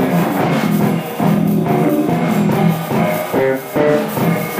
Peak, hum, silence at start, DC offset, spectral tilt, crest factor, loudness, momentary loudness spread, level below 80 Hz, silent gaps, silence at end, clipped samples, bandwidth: -2 dBFS; none; 0 s; under 0.1%; -7 dB/octave; 12 dB; -15 LUFS; 2 LU; -52 dBFS; none; 0 s; under 0.1%; 16 kHz